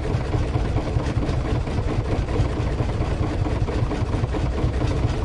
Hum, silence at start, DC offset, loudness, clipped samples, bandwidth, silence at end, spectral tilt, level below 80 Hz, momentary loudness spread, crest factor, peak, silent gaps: none; 0 s; under 0.1%; -24 LUFS; under 0.1%; 11 kHz; 0 s; -7.5 dB/octave; -26 dBFS; 1 LU; 14 dB; -10 dBFS; none